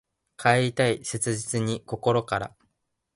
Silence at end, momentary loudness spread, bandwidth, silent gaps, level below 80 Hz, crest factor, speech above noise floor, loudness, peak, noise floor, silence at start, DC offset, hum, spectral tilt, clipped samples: 0.65 s; 8 LU; 11.5 kHz; none; -58 dBFS; 20 dB; 50 dB; -25 LUFS; -6 dBFS; -75 dBFS; 0.4 s; under 0.1%; none; -4.5 dB/octave; under 0.1%